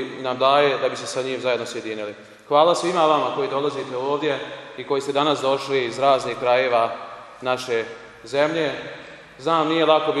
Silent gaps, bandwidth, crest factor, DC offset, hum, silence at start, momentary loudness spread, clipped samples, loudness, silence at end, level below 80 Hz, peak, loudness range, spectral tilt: none; 12.5 kHz; 20 dB; under 0.1%; none; 0 s; 16 LU; under 0.1%; -21 LUFS; 0 s; -66 dBFS; -2 dBFS; 3 LU; -4 dB/octave